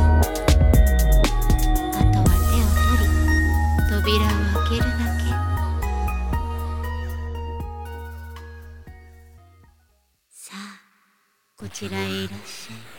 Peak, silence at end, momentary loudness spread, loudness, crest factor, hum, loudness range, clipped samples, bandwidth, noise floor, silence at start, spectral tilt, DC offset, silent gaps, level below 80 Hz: -4 dBFS; 0 s; 19 LU; -21 LUFS; 16 dB; none; 21 LU; under 0.1%; 17.5 kHz; -65 dBFS; 0 s; -5.5 dB/octave; under 0.1%; none; -22 dBFS